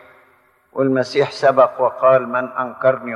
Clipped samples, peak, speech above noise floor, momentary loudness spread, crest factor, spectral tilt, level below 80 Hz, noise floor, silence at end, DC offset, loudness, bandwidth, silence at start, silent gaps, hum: under 0.1%; 0 dBFS; 39 dB; 8 LU; 16 dB; -6 dB/octave; -70 dBFS; -56 dBFS; 0 s; under 0.1%; -17 LUFS; 10 kHz; 0.75 s; none; none